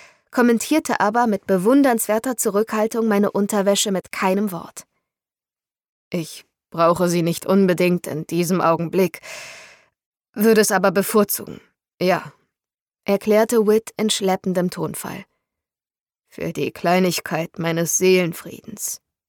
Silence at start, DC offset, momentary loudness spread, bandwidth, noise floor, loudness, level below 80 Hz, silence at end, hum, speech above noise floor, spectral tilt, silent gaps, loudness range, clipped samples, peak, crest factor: 0.35 s; under 0.1%; 16 LU; 19 kHz; under -90 dBFS; -19 LUFS; -64 dBFS; 0.35 s; none; over 71 dB; -4.5 dB/octave; 5.89-6.11 s, 10.06-10.12 s, 10.29-10.33 s, 11.94-11.98 s, 12.81-12.86 s, 16.01-16.06 s; 5 LU; under 0.1%; -4 dBFS; 16 dB